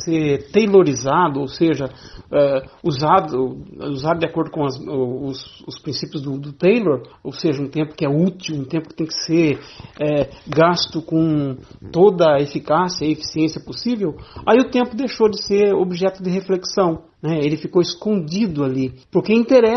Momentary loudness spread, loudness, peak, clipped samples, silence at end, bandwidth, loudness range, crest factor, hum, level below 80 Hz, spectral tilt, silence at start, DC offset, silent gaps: 11 LU; -19 LUFS; -2 dBFS; under 0.1%; 0 s; 6.4 kHz; 4 LU; 16 dB; none; -50 dBFS; -6 dB/octave; 0 s; under 0.1%; none